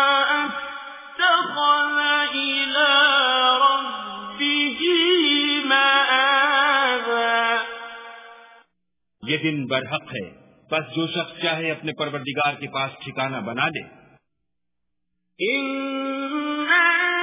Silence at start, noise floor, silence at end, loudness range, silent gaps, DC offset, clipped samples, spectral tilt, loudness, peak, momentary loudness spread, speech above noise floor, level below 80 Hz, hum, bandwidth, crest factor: 0 s; -82 dBFS; 0 s; 10 LU; none; under 0.1%; under 0.1%; -0.5 dB/octave; -20 LUFS; -6 dBFS; 15 LU; 56 dB; -68 dBFS; none; 3.9 kHz; 16 dB